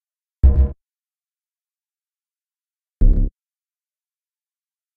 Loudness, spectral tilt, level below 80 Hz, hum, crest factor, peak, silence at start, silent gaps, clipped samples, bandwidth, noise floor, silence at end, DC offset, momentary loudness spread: -20 LUFS; -12.5 dB/octave; -22 dBFS; none; 18 dB; -2 dBFS; 0.45 s; none; under 0.1%; 1.8 kHz; under -90 dBFS; 1.7 s; under 0.1%; 7 LU